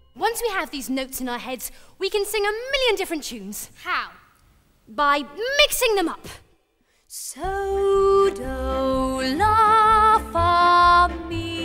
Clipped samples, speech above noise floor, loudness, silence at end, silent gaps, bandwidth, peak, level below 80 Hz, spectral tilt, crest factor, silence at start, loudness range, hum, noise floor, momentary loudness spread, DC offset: under 0.1%; 40 dB; -20 LUFS; 0 s; none; 16 kHz; -4 dBFS; -40 dBFS; -3.5 dB/octave; 18 dB; 0.15 s; 8 LU; none; -65 dBFS; 17 LU; under 0.1%